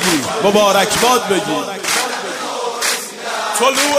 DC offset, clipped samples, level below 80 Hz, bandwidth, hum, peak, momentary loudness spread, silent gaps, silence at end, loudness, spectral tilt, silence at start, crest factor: under 0.1%; under 0.1%; -52 dBFS; 16 kHz; none; 0 dBFS; 9 LU; none; 0 s; -15 LUFS; -2 dB/octave; 0 s; 16 dB